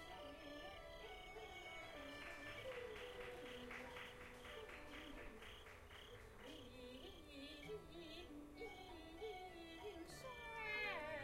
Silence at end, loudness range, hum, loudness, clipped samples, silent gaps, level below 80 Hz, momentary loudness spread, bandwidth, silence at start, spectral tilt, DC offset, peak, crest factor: 0 s; 4 LU; none; -54 LUFS; under 0.1%; none; -66 dBFS; 7 LU; 16 kHz; 0 s; -4 dB/octave; under 0.1%; -34 dBFS; 20 dB